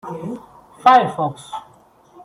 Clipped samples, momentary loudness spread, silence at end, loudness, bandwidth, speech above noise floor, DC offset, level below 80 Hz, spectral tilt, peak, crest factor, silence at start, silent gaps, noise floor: under 0.1%; 21 LU; 0.65 s; -16 LUFS; 11.5 kHz; 34 dB; under 0.1%; -64 dBFS; -5.5 dB/octave; -2 dBFS; 18 dB; 0.05 s; none; -51 dBFS